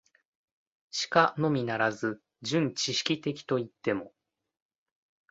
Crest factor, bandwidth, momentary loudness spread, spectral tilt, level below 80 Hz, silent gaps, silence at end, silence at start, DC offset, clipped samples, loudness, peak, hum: 24 dB; 8 kHz; 10 LU; -4.5 dB/octave; -72 dBFS; none; 1.25 s; 0.95 s; under 0.1%; under 0.1%; -29 LUFS; -8 dBFS; none